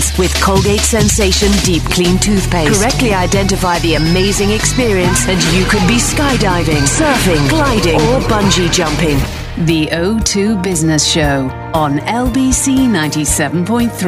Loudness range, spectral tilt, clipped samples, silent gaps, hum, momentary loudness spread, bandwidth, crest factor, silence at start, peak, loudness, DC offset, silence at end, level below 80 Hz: 2 LU; -4 dB/octave; under 0.1%; none; none; 4 LU; 15.5 kHz; 12 dB; 0 s; 0 dBFS; -12 LUFS; under 0.1%; 0 s; -22 dBFS